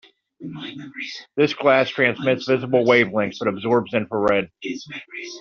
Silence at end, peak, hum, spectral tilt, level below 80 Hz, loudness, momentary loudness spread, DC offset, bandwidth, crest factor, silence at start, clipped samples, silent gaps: 0 s; -2 dBFS; none; -3.5 dB/octave; -62 dBFS; -20 LUFS; 17 LU; under 0.1%; 7 kHz; 18 dB; 0.4 s; under 0.1%; none